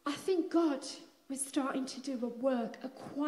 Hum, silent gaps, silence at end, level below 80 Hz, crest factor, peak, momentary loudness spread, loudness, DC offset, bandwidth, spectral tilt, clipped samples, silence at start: none; none; 0 s; -84 dBFS; 16 dB; -18 dBFS; 13 LU; -35 LUFS; under 0.1%; 14 kHz; -3.5 dB/octave; under 0.1%; 0.05 s